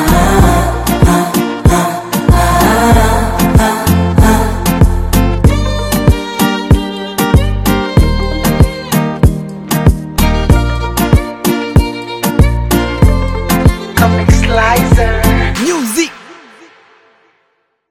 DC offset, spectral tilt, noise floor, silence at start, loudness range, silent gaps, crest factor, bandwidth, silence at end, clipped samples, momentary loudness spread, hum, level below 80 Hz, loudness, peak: under 0.1%; -5.5 dB/octave; -60 dBFS; 0 s; 3 LU; none; 10 dB; 17.5 kHz; 1.6 s; under 0.1%; 5 LU; none; -16 dBFS; -11 LUFS; 0 dBFS